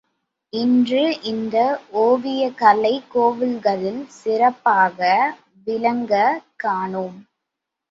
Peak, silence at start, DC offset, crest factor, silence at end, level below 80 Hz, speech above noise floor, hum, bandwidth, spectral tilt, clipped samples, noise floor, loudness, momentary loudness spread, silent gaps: -2 dBFS; 0.55 s; under 0.1%; 18 dB; 0.7 s; -68 dBFS; 63 dB; none; 7.6 kHz; -6 dB/octave; under 0.1%; -82 dBFS; -19 LUFS; 10 LU; none